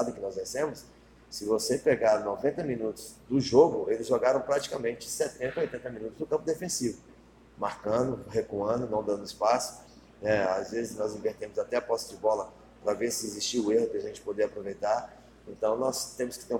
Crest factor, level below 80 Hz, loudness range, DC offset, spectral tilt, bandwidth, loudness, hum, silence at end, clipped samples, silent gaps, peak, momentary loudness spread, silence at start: 22 dB; -60 dBFS; 5 LU; under 0.1%; -4 dB/octave; 17 kHz; -30 LUFS; none; 0 s; under 0.1%; none; -8 dBFS; 10 LU; 0 s